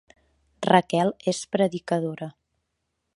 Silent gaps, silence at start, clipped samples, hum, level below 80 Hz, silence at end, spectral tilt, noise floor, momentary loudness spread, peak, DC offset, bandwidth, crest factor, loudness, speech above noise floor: none; 0.6 s; under 0.1%; none; -66 dBFS; 0.85 s; -5.5 dB/octave; -78 dBFS; 13 LU; -4 dBFS; under 0.1%; 11.5 kHz; 22 dB; -24 LUFS; 55 dB